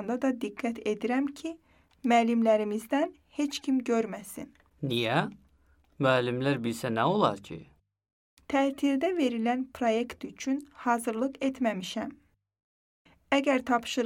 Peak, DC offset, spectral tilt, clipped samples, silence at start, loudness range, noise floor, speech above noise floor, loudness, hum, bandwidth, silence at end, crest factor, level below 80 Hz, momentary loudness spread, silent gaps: -8 dBFS; under 0.1%; -5.5 dB/octave; under 0.1%; 0 s; 3 LU; -64 dBFS; 36 dB; -29 LUFS; none; 16.5 kHz; 0 s; 20 dB; -68 dBFS; 13 LU; 8.13-8.37 s, 12.63-13.05 s